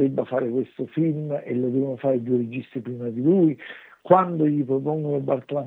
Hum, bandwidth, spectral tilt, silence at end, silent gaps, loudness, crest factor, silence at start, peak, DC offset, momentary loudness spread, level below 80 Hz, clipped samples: none; 4 kHz; -11 dB/octave; 0 s; none; -23 LUFS; 20 dB; 0 s; -2 dBFS; under 0.1%; 12 LU; -74 dBFS; under 0.1%